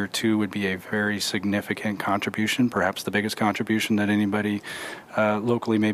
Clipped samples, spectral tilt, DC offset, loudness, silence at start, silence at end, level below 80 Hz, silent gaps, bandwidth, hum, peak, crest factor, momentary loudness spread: under 0.1%; -5 dB/octave; under 0.1%; -25 LUFS; 0 s; 0 s; -66 dBFS; none; 15.5 kHz; none; -8 dBFS; 16 dB; 5 LU